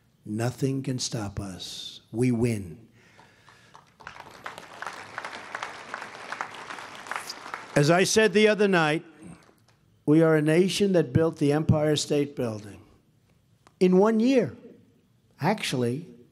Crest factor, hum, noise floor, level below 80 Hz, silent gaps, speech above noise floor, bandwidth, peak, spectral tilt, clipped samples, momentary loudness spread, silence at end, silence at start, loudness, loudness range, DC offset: 22 dB; none; -63 dBFS; -58 dBFS; none; 40 dB; 15.5 kHz; -6 dBFS; -5.5 dB/octave; under 0.1%; 18 LU; 0.15 s; 0.25 s; -25 LUFS; 15 LU; under 0.1%